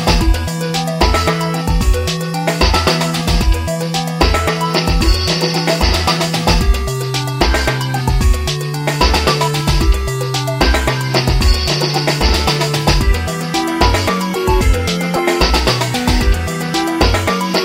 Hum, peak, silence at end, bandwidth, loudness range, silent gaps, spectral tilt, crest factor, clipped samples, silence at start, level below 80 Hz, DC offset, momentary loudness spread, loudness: none; 0 dBFS; 0 s; 16 kHz; 1 LU; none; -4.5 dB/octave; 14 dB; under 0.1%; 0 s; -18 dBFS; under 0.1%; 5 LU; -15 LUFS